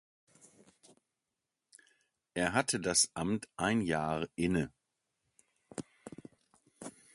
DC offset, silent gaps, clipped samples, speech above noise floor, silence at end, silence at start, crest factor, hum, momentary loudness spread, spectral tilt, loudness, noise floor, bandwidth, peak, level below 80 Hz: under 0.1%; none; under 0.1%; 56 dB; 0.25 s; 2.35 s; 26 dB; none; 22 LU; -3.5 dB/octave; -33 LUFS; -89 dBFS; 11.5 kHz; -12 dBFS; -62 dBFS